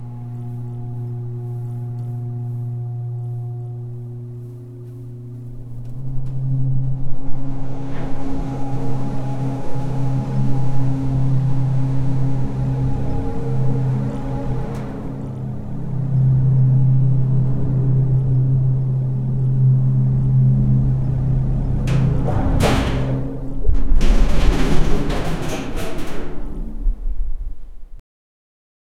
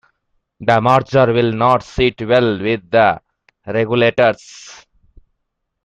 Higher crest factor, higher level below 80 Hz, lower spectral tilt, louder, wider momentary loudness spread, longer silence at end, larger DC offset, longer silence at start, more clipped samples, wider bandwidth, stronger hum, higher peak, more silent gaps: about the same, 16 dB vs 16 dB; first, -24 dBFS vs -44 dBFS; first, -8 dB/octave vs -6.5 dB/octave; second, -21 LUFS vs -15 LUFS; first, 15 LU vs 10 LU; about the same, 1 s vs 1.1 s; neither; second, 0 s vs 0.6 s; neither; about the same, 10 kHz vs 9.8 kHz; neither; about the same, -2 dBFS vs 0 dBFS; neither